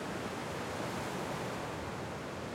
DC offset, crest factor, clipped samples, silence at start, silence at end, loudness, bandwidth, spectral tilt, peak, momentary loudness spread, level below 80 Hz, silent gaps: under 0.1%; 14 dB; under 0.1%; 0 s; 0 s; -39 LUFS; 16.5 kHz; -5 dB/octave; -24 dBFS; 3 LU; -62 dBFS; none